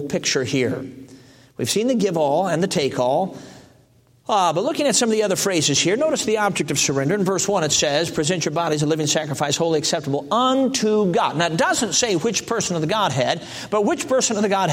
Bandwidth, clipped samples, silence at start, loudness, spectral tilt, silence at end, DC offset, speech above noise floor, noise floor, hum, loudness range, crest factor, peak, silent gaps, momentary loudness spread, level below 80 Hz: 16.5 kHz; under 0.1%; 0 s; -20 LUFS; -3.5 dB/octave; 0 s; under 0.1%; 35 dB; -55 dBFS; none; 3 LU; 16 dB; -4 dBFS; none; 5 LU; -58 dBFS